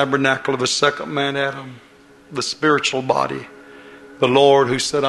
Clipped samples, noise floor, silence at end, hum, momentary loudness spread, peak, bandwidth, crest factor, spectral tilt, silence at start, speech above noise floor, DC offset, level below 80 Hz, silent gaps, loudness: under 0.1%; -41 dBFS; 0 s; none; 17 LU; 0 dBFS; 12 kHz; 18 dB; -3.5 dB/octave; 0 s; 23 dB; under 0.1%; -56 dBFS; none; -18 LUFS